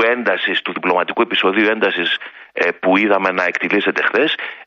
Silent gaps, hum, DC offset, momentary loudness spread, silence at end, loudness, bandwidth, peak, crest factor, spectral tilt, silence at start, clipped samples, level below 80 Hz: none; none; under 0.1%; 5 LU; 0.05 s; -16 LUFS; 7.4 kHz; -2 dBFS; 16 dB; -5 dB/octave; 0 s; under 0.1%; -66 dBFS